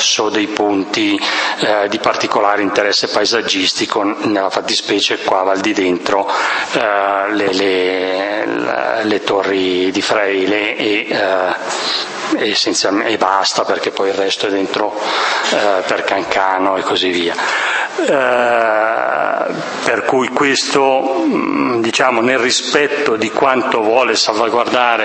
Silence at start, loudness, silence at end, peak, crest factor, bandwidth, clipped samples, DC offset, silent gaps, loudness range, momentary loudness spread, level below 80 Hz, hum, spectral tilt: 0 s; -14 LUFS; 0 s; 0 dBFS; 14 dB; 8.8 kHz; under 0.1%; under 0.1%; none; 2 LU; 4 LU; -60 dBFS; none; -2.5 dB/octave